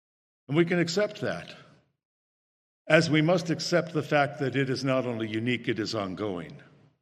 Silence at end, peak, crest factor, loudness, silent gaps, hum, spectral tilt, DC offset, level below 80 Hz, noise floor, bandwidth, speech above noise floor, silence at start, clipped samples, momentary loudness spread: 0.4 s; -4 dBFS; 24 dB; -27 LUFS; 2.05-2.85 s; none; -5.5 dB/octave; under 0.1%; -72 dBFS; under -90 dBFS; 12.5 kHz; over 63 dB; 0.5 s; under 0.1%; 10 LU